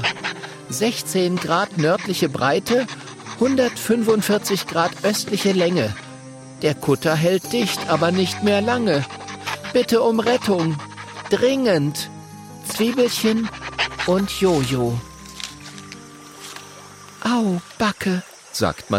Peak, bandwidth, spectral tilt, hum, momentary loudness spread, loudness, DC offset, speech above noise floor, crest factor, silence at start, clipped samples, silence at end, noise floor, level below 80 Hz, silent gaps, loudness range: -4 dBFS; 16.5 kHz; -4.5 dB/octave; none; 17 LU; -20 LUFS; under 0.1%; 22 dB; 18 dB; 0 s; under 0.1%; 0 s; -41 dBFS; -52 dBFS; none; 5 LU